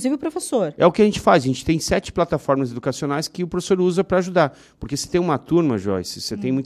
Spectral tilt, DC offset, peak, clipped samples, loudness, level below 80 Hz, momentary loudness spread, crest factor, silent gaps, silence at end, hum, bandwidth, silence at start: -5.5 dB/octave; under 0.1%; -2 dBFS; under 0.1%; -20 LUFS; -44 dBFS; 8 LU; 18 dB; none; 0 s; none; 14 kHz; 0 s